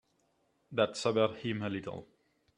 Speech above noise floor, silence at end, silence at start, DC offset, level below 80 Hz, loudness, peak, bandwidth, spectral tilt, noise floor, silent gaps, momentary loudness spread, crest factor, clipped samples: 42 dB; 0.55 s; 0.7 s; under 0.1%; -74 dBFS; -33 LUFS; -14 dBFS; 11 kHz; -5 dB/octave; -75 dBFS; none; 12 LU; 22 dB; under 0.1%